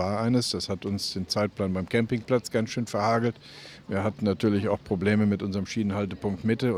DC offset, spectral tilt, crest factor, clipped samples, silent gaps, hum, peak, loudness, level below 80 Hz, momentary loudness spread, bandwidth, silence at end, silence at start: under 0.1%; -6 dB/octave; 18 dB; under 0.1%; none; none; -10 dBFS; -27 LUFS; -60 dBFS; 6 LU; 15 kHz; 0 s; 0 s